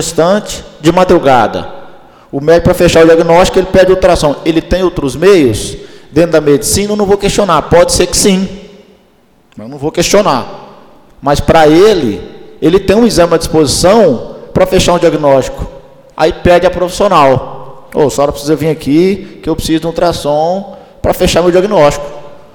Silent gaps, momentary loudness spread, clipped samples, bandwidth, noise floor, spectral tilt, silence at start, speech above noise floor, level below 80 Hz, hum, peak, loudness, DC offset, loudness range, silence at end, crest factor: none; 12 LU; 0.2%; 19.5 kHz; -48 dBFS; -5 dB/octave; 0 s; 39 dB; -28 dBFS; none; 0 dBFS; -9 LUFS; under 0.1%; 4 LU; 0.15 s; 10 dB